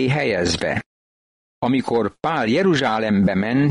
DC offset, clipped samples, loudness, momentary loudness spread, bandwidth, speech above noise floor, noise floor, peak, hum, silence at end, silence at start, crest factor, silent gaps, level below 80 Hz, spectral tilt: under 0.1%; under 0.1%; -20 LUFS; 5 LU; 11 kHz; over 71 dB; under -90 dBFS; -8 dBFS; none; 0 s; 0 s; 12 dB; 0.86-1.62 s; -48 dBFS; -6 dB/octave